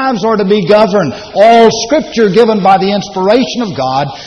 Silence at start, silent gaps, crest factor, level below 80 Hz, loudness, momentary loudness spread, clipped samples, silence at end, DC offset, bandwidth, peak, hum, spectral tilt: 0 s; none; 10 dB; -44 dBFS; -9 LUFS; 7 LU; 0.5%; 0 s; under 0.1%; 9.4 kHz; 0 dBFS; none; -5 dB/octave